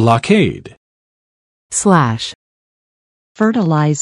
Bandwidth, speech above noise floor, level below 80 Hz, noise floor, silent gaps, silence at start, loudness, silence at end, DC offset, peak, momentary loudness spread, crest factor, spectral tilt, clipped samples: 11.5 kHz; over 77 dB; -50 dBFS; under -90 dBFS; 0.77-1.70 s, 2.35-3.35 s; 0 s; -14 LUFS; 0 s; under 0.1%; 0 dBFS; 11 LU; 16 dB; -5.5 dB/octave; under 0.1%